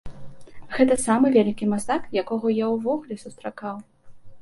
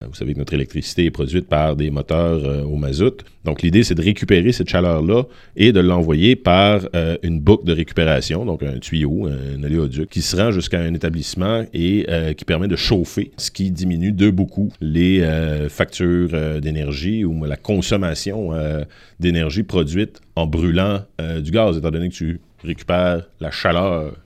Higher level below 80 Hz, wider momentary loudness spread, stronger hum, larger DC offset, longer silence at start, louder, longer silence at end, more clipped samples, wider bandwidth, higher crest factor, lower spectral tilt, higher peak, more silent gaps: second, -52 dBFS vs -32 dBFS; first, 16 LU vs 9 LU; neither; neither; about the same, 0.05 s vs 0 s; second, -23 LUFS vs -19 LUFS; about the same, 0 s vs 0.05 s; neither; second, 11.5 kHz vs 14.5 kHz; about the same, 18 dB vs 18 dB; about the same, -5.5 dB/octave vs -6.5 dB/octave; second, -4 dBFS vs 0 dBFS; neither